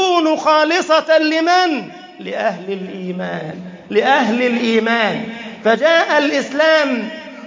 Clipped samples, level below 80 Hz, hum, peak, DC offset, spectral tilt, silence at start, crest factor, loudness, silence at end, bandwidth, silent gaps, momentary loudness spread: under 0.1%; -68 dBFS; none; -2 dBFS; under 0.1%; -4 dB/octave; 0 s; 14 dB; -15 LUFS; 0 s; 7.6 kHz; none; 14 LU